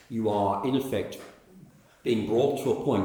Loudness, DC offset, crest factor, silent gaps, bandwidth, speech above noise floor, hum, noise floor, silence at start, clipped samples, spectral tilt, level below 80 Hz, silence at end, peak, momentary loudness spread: -27 LUFS; under 0.1%; 16 dB; none; over 20 kHz; 27 dB; none; -53 dBFS; 0.1 s; under 0.1%; -6.5 dB/octave; -64 dBFS; 0 s; -12 dBFS; 10 LU